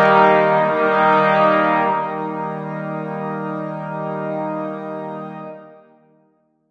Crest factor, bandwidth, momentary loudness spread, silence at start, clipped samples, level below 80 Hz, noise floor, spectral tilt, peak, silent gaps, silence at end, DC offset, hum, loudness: 18 dB; 7 kHz; 15 LU; 0 s; under 0.1%; -66 dBFS; -61 dBFS; -7.5 dB/octave; -2 dBFS; none; 0.95 s; under 0.1%; none; -18 LUFS